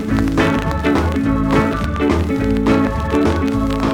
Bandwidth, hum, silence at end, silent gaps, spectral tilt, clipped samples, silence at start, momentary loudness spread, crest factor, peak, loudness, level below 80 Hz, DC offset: 16 kHz; none; 0 s; none; -7 dB/octave; under 0.1%; 0 s; 2 LU; 12 dB; -4 dBFS; -17 LUFS; -26 dBFS; under 0.1%